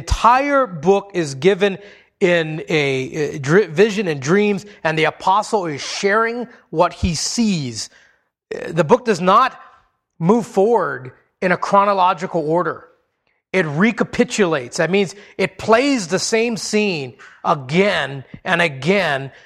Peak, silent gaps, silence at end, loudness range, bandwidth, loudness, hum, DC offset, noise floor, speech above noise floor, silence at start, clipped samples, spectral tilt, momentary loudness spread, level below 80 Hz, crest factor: 0 dBFS; none; 0.15 s; 2 LU; 13.5 kHz; -18 LUFS; none; under 0.1%; -68 dBFS; 50 dB; 0 s; under 0.1%; -5 dB/octave; 9 LU; -40 dBFS; 18 dB